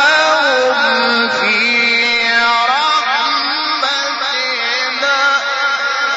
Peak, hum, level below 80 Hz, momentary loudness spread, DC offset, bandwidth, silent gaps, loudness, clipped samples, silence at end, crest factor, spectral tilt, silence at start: -2 dBFS; none; -62 dBFS; 4 LU; under 0.1%; 8 kHz; none; -12 LUFS; under 0.1%; 0 s; 12 dB; 2.5 dB/octave; 0 s